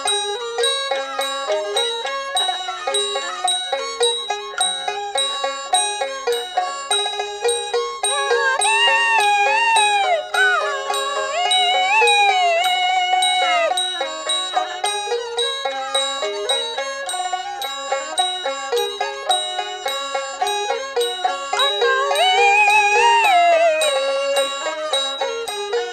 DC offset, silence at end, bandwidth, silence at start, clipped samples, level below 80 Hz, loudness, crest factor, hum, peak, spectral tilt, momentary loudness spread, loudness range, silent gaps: under 0.1%; 0 s; 15 kHz; 0 s; under 0.1%; -64 dBFS; -18 LUFS; 14 dB; 60 Hz at -70 dBFS; -4 dBFS; 2 dB/octave; 10 LU; 7 LU; none